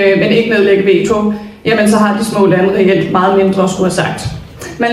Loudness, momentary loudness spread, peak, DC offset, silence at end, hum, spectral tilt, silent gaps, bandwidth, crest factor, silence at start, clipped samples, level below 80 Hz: -11 LUFS; 9 LU; 0 dBFS; under 0.1%; 0 s; none; -5.5 dB/octave; none; 13.5 kHz; 10 dB; 0 s; under 0.1%; -40 dBFS